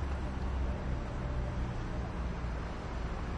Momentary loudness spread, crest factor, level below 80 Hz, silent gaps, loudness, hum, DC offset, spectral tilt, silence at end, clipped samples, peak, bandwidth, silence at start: 3 LU; 12 dB; -38 dBFS; none; -38 LUFS; none; under 0.1%; -7 dB/octave; 0 s; under 0.1%; -22 dBFS; 8.6 kHz; 0 s